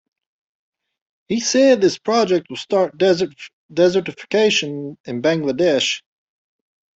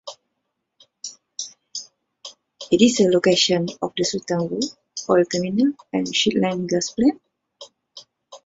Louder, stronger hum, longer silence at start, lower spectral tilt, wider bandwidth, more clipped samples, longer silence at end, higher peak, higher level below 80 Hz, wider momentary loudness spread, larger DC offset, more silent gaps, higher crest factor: about the same, -18 LUFS vs -20 LUFS; neither; first, 1.3 s vs 0.05 s; about the same, -4 dB/octave vs -4 dB/octave; about the same, 8 kHz vs 8 kHz; neither; first, 1 s vs 0.1 s; about the same, -2 dBFS vs -2 dBFS; about the same, -62 dBFS vs -60 dBFS; second, 12 LU vs 23 LU; neither; first, 3.53-3.69 s, 5.00-5.04 s vs none; about the same, 16 dB vs 20 dB